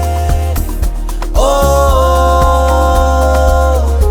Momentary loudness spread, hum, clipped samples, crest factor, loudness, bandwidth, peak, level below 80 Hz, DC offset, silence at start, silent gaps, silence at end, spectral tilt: 8 LU; none; under 0.1%; 10 dB; -12 LUFS; 18.5 kHz; 0 dBFS; -12 dBFS; under 0.1%; 0 s; none; 0 s; -6 dB/octave